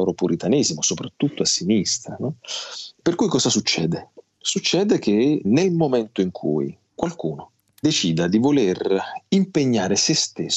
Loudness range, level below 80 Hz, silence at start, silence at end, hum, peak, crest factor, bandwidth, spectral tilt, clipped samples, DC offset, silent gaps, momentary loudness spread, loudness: 2 LU; -62 dBFS; 0 s; 0 s; none; -2 dBFS; 18 dB; 8.6 kHz; -4 dB/octave; under 0.1%; under 0.1%; none; 11 LU; -21 LUFS